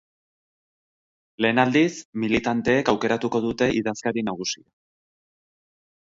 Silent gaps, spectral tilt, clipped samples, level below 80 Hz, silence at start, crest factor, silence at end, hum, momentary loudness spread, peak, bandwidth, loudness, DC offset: 2.05-2.13 s; -5 dB/octave; under 0.1%; -56 dBFS; 1.4 s; 22 dB; 1.55 s; none; 9 LU; -4 dBFS; 7.8 kHz; -23 LUFS; under 0.1%